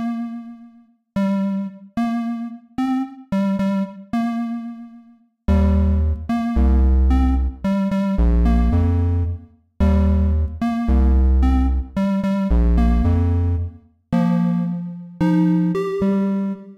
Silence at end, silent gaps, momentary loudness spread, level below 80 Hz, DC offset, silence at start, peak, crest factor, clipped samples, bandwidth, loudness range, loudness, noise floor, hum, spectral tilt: 0.05 s; none; 11 LU; -22 dBFS; under 0.1%; 0 s; -8 dBFS; 10 dB; under 0.1%; 6.2 kHz; 5 LU; -20 LUFS; -50 dBFS; none; -9.5 dB/octave